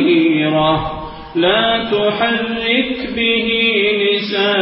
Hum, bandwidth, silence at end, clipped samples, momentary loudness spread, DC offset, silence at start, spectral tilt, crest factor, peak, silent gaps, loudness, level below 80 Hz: none; 5.8 kHz; 0 s; under 0.1%; 6 LU; under 0.1%; 0 s; -10 dB/octave; 14 dB; -2 dBFS; none; -15 LUFS; -42 dBFS